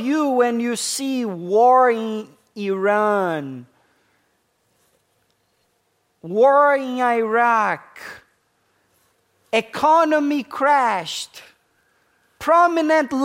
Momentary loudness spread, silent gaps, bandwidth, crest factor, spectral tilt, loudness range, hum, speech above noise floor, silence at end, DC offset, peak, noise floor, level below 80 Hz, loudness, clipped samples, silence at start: 15 LU; none; 16 kHz; 16 dB; -4 dB/octave; 6 LU; none; 49 dB; 0 s; under 0.1%; -4 dBFS; -67 dBFS; -68 dBFS; -18 LUFS; under 0.1%; 0 s